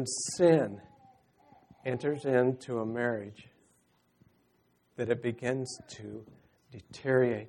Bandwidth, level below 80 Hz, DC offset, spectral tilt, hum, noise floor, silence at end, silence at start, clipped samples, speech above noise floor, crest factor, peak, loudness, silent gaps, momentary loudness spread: 11.5 kHz; -72 dBFS; under 0.1%; -5.5 dB/octave; none; -71 dBFS; 0 s; 0 s; under 0.1%; 40 dB; 22 dB; -12 dBFS; -31 LUFS; none; 21 LU